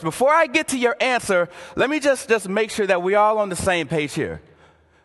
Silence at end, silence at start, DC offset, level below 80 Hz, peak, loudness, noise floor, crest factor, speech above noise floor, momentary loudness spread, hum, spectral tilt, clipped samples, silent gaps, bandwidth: 0.65 s; 0 s; under 0.1%; -50 dBFS; -4 dBFS; -20 LUFS; -54 dBFS; 16 dB; 34 dB; 8 LU; none; -4 dB/octave; under 0.1%; none; 12.5 kHz